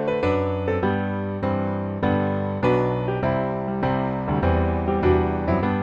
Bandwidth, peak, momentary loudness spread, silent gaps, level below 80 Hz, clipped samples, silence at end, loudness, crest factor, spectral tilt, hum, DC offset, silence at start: 7 kHz; -8 dBFS; 5 LU; none; -36 dBFS; under 0.1%; 0 s; -23 LUFS; 14 dB; -9.5 dB/octave; none; under 0.1%; 0 s